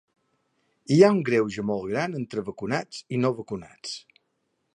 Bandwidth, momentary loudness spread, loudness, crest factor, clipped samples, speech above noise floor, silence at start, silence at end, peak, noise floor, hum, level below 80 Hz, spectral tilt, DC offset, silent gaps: 10.5 kHz; 18 LU; -25 LUFS; 22 dB; under 0.1%; 51 dB; 0.9 s; 0.75 s; -4 dBFS; -75 dBFS; none; -64 dBFS; -6.5 dB/octave; under 0.1%; none